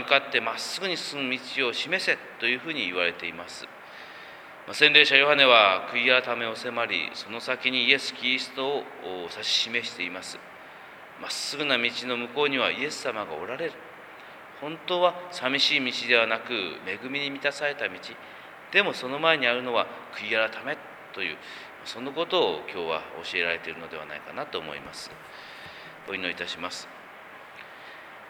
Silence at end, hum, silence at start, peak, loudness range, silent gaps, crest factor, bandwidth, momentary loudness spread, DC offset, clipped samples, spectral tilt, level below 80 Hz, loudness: 0 s; none; 0 s; 0 dBFS; 12 LU; none; 28 dB; over 20 kHz; 22 LU; under 0.1%; under 0.1%; -2.5 dB/octave; -74 dBFS; -25 LUFS